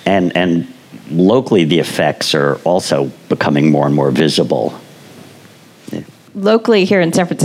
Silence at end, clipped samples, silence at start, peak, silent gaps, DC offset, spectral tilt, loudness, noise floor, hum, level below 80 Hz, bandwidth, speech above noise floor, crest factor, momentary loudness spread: 0 s; under 0.1%; 0.05 s; 0 dBFS; none; under 0.1%; -5.5 dB/octave; -13 LUFS; -41 dBFS; none; -58 dBFS; 16 kHz; 29 dB; 14 dB; 11 LU